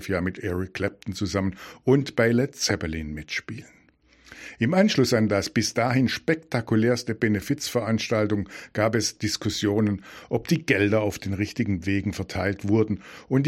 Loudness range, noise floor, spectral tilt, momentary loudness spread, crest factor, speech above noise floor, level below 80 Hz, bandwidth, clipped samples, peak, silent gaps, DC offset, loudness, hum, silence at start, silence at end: 3 LU; -58 dBFS; -5.5 dB/octave; 10 LU; 20 dB; 33 dB; -52 dBFS; 16 kHz; under 0.1%; -4 dBFS; none; under 0.1%; -25 LUFS; none; 0 s; 0 s